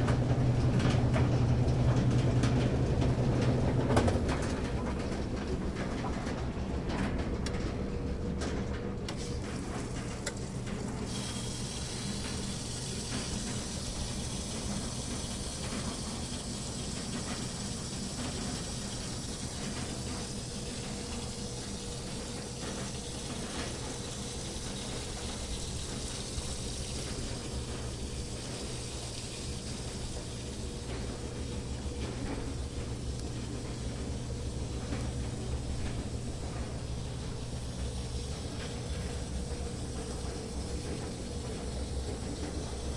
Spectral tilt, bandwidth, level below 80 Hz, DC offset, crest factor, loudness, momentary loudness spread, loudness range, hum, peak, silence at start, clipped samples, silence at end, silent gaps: -5 dB/octave; 11.5 kHz; -42 dBFS; under 0.1%; 24 dB; -35 LUFS; 10 LU; 9 LU; none; -10 dBFS; 0 s; under 0.1%; 0 s; none